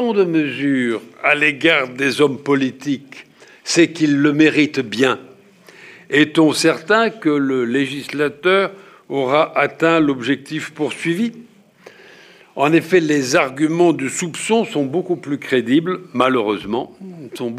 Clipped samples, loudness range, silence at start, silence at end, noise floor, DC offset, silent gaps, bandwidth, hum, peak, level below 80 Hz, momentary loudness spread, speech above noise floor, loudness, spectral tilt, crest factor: under 0.1%; 3 LU; 0 s; 0 s; -45 dBFS; under 0.1%; none; 14.5 kHz; none; -2 dBFS; -62 dBFS; 10 LU; 28 dB; -17 LUFS; -4.5 dB/octave; 16 dB